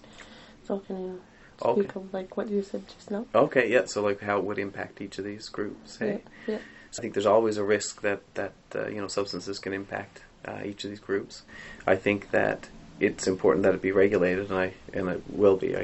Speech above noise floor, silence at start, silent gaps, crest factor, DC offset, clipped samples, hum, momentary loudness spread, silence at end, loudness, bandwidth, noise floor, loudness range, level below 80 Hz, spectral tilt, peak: 21 dB; 0.05 s; none; 22 dB; under 0.1%; under 0.1%; none; 15 LU; 0 s; -28 LUFS; 8.2 kHz; -49 dBFS; 7 LU; -58 dBFS; -5 dB/octave; -6 dBFS